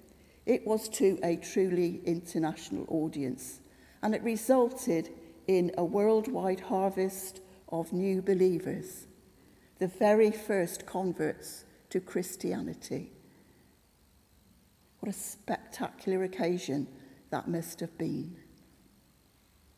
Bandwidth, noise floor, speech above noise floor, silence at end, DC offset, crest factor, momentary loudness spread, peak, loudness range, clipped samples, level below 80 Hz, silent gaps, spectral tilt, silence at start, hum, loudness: 16 kHz; -65 dBFS; 34 dB; 1.35 s; under 0.1%; 20 dB; 14 LU; -12 dBFS; 10 LU; under 0.1%; -66 dBFS; none; -6 dB/octave; 0.45 s; none; -32 LUFS